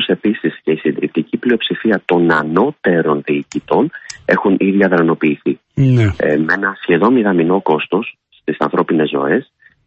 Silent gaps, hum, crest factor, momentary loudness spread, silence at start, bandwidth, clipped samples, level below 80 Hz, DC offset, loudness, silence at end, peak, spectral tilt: none; none; 14 dB; 7 LU; 0 s; 8.4 kHz; under 0.1%; -44 dBFS; under 0.1%; -15 LUFS; 0.45 s; -2 dBFS; -7.5 dB/octave